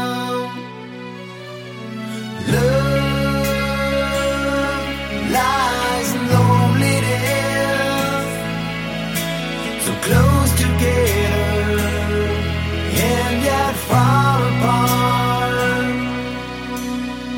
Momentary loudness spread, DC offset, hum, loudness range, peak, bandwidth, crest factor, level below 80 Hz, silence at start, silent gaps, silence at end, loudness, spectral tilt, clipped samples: 12 LU; under 0.1%; none; 3 LU; 0 dBFS; 16.5 kHz; 18 dB; -32 dBFS; 0 s; none; 0 s; -18 LUFS; -5 dB/octave; under 0.1%